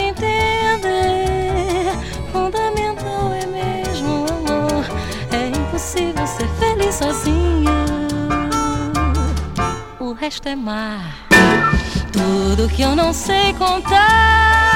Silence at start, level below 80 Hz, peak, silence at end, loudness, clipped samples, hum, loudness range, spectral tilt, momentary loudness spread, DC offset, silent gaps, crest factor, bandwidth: 0 s; -26 dBFS; 0 dBFS; 0 s; -17 LUFS; under 0.1%; none; 6 LU; -4.5 dB/octave; 12 LU; under 0.1%; none; 16 dB; 17 kHz